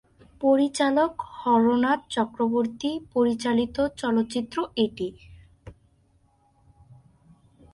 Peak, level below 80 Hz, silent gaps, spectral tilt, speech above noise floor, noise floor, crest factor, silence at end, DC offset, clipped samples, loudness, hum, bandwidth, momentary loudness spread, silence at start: -8 dBFS; -56 dBFS; none; -5 dB/octave; 40 dB; -63 dBFS; 18 dB; 2 s; under 0.1%; under 0.1%; -25 LUFS; none; 11.5 kHz; 7 LU; 0.4 s